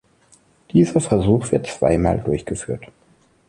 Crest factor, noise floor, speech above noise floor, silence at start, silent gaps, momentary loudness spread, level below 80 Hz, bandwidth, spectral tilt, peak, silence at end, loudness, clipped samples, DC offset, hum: 18 dB; -57 dBFS; 38 dB; 0.75 s; none; 10 LU; -38 dBFS; 11.5 kHz; -7 dB/octave; -2 dBFS; 0.65 s; -19 LUFS; under 0.1%; under 0.1%; none